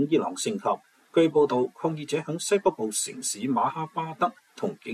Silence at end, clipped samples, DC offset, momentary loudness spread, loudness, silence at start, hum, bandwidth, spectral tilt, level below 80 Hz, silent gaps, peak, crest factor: 0 s; under 0.1%; under 0.1%; 10 LU; -27 LUFS; 0 s; none; 14.5 kHz; -4.5 dB/octave; -72 dBFS; none; -8 dBFS; 18 dB